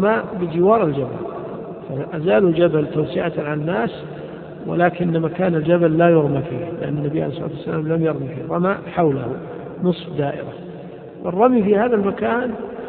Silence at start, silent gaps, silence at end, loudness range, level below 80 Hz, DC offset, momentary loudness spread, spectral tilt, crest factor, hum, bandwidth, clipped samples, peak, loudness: 0 s; none; 0 s; 3 LU; -52 dBFS; under 0.1%; 15 LU; -12.5 dB/octave; 18 dB; none; 4.4 kHz; under 0.1%; 0 dBFS; -19 LUFS